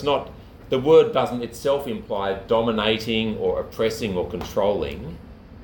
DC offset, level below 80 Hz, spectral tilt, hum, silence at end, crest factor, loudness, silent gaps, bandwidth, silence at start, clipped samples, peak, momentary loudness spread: under 0.1%; -44 dBFS; -5.5 dB/octave; none; 0 s; 18 dB; -22 LUFS; none; 18.5 kHz; 0 s; under 0.1%; -4 dBFS; 12 LU